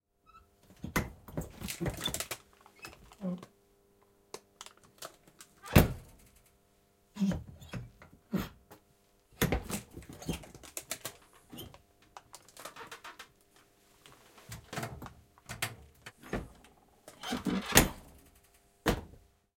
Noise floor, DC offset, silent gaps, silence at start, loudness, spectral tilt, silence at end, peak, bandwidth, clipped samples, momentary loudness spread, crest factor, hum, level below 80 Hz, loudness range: -68 dBFS; under 0.1%; none; 0.35 s; -35 LUFS; -4 dB/octave; 0.4 s; -4 dBFS; 16.5 kHz; under 0.1%; 24 LU; 34 dB; none; -48 dBFS; 14 LU